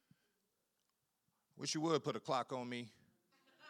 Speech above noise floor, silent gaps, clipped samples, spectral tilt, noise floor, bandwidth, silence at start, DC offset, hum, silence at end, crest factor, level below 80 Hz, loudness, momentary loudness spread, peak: 45 dB; none; under 0.1%; -4 dB/octave; -85 dBFS; 14.5 kHz; 1.55 s; under 0.1%; none; 0 s; 24 dB; under -90 dBFS; -41 LUFS; 10 LU; -22 dBFS